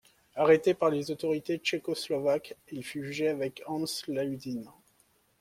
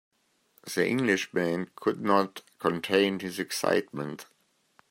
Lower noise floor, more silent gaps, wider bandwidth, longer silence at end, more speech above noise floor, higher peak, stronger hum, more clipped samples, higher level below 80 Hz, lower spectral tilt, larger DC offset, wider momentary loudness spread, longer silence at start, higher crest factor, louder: about the same, -68 dBFS vs -67 dBFS; neither; about the same, 16 kHz vs 16 kHz; about the same, 0.7 s vs 0.65 s; about the same, 38 dB vs 39 dB; about the same, -10 dBFS vs -8 dBFS; neither; neither; about the same, -72 dBFS vs -74 dBFS; about the same, -5 dB/octave vs -4.5 dB/octave; neither; first, 15 LU vs 12 LU; second, 0.35 s vs 0.65 s; about the same, 20 dB vs 22 dB; about the same, -30 LUFS vs -28 LUFS